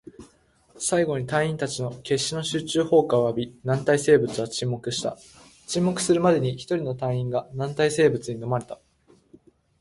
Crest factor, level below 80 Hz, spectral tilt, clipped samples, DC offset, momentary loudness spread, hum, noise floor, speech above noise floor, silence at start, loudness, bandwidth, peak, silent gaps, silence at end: 20 dB; -58 dBFS; -5 dB/octave; under 0.1%; under 0.1%; 10 LU; none; -59 dBFS; 36 dB; 0.2 s; -24 LUFS; 11.5 kHz; -6 dBFS; none; 1.05 s